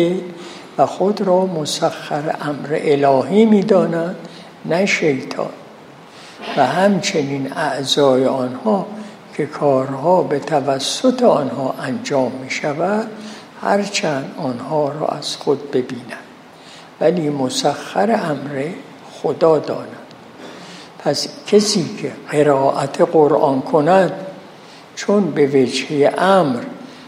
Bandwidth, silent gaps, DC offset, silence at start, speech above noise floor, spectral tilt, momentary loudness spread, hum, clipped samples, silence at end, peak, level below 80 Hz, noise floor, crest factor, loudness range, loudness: 15 kHz; none; under 0.1%; 0 s; 24 dB; -5 dB/octave; 18 LU; none; under 0.1%; 0 s; 0 dBFS; -68 dBFS; -40 dBFS; 18 dB; 5 LU; -17 LUFS